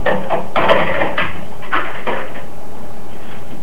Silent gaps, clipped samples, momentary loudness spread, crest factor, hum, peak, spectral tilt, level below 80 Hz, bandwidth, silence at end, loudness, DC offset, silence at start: none; under 0.1%; 20 LU; 22 dB; none; 0 dBFS; -5.5 dB/octave; -42 dBFS; 16 kHz; 0 s; -18 LUFS; 20%; 0 s